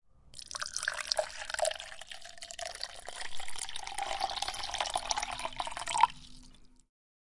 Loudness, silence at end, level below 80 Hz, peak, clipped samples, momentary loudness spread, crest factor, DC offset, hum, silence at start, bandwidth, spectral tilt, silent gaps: -35 LUFS; 0.4 s; -56 dBFS; -8 dBFS; under 0.1%; 15 LU; 28 dB; under 0.1%; none; 0.15 s; 11.5 kHz; 0 dB/octave; none